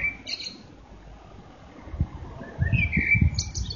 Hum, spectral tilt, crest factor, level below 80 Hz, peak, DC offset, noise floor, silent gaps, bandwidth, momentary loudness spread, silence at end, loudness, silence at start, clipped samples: none; -4 dB/octave; 20 dB; -36 dBFS; -8 dBFS; under 0.1%; -47 dBFS; none; 7.2 kHz; 26 LU; 0 s; -25 LUFS; 0 s; under 0.1%